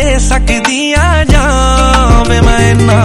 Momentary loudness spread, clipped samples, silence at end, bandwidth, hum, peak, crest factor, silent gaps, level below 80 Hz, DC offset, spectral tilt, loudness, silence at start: 3 LU; 3%; 0 s; 12 kHz; none; 0 dBFS; 8 dB; none; -12 dBFS; under 0.1%; -5 dB/octave; -9 LUFS; 0 s